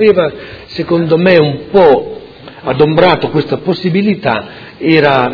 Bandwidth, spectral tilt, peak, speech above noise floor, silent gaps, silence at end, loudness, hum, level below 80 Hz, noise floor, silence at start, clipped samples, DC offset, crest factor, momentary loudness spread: 5.4 kHz; -8.5 dB/octave; 0 dBFS; 21 dB; none; 0 s; -11 LUFS; none; -44 dBFS; -31 dBFS; 0 s; 0.8%; under 0.1%; 10 dB; 16 LU